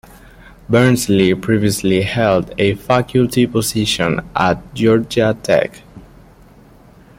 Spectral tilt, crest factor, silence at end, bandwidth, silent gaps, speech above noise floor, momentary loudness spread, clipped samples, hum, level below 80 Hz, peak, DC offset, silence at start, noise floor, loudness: -5.5 dB/octave; 16 dB; 1.2 s; 16.5 kHz; none; 29 dB; 4 LU; under 0.1%; none; -42 dBFS; 0 dBFS; under 0.1%; 0.7 s; -44 dBFS; -15 LUFS